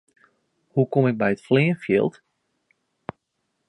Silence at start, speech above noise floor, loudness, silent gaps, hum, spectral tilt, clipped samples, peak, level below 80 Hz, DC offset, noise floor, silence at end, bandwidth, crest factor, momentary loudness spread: 0.75 s; 55 dB; -22 LUFS; none; none; -8.5 dB/octave; under 0.1%; -6 dBFS; -64 dBFS; under 0.1%; -76 dBFS; 1.6 s; 10.5 kHz; 18 dB; 20 LU